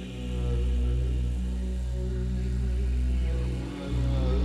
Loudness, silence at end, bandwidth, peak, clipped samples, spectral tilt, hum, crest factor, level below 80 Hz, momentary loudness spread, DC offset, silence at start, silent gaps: -30 LUFS; 0 s; 9.6 kHz; -16 dBFS; under 0.1%; -7.5 dB/octave; none; 12 dB; -28 dBFS; 4 LU; under 0.1%; 0 s; none